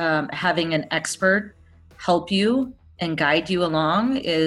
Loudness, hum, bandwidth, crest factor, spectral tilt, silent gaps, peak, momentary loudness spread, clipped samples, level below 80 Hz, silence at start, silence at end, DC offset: -22 LUFS; none; 12.5 kHz; 18 dB; -4.5 dB/octave; none; -6 dBFS; 8 LU; under 0.1%; -54 dBFS; 0 s; 0 s; under 0.1%